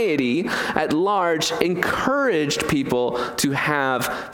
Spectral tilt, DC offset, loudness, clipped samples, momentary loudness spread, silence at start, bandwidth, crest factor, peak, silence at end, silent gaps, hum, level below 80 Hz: -4 dB/octave; under 0.1%; -21 LUFS; under 0.1%; 3 LU; 0 s; 19 kHz; 18 dB; -2 dBFS; 0 s; none; none; -50 dBFS